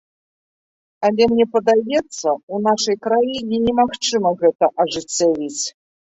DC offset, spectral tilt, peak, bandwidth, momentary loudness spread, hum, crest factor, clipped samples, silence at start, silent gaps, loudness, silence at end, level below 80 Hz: under 0.1%; -3.5 dB/octave; -2 dBFS; 8.2 kHz; 7 LU; none; 16 dB; under 0.1%; 1 s; 2.43-2.48 s, 4.55-4.59 s; -18 LUFS; 0.35 s; -54 dBFS